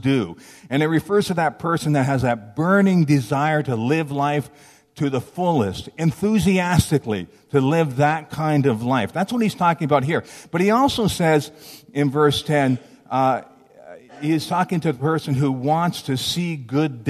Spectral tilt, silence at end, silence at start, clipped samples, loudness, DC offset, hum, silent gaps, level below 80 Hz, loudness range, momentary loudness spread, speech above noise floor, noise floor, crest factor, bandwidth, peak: -6 dB/octave; 0 s; 0 s; under 0.1%; -20 LUFS; under 0.1%; none; none; -50 dBFS; 3 LU; 7 LU; 24 dB; -44 dBFS; 18 dB; 14 kHz; -2 dBFS